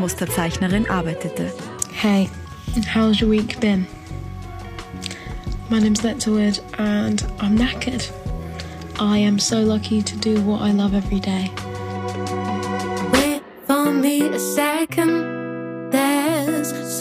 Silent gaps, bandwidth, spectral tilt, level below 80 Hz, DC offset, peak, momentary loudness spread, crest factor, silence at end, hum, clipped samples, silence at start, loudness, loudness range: none; 15.5 kHz; -5 dB/octave; -38 dBFS; under 0.1%; -2 dBFS; 13 LU; 18 dB; 0 s; none; under 0.1%; 0 s; -21 LUFS; 2 LU